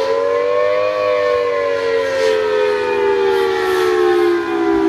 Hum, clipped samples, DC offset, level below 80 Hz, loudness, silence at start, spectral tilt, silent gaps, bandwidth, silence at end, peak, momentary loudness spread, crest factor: none; under 0.1%; under 0.1%; -50 dBFS; -16 LUFS; 0 s; -4.5 dB/octave; none; 14.5 kHz; 0 s; -4 dBFS; 3 LU; 12 dB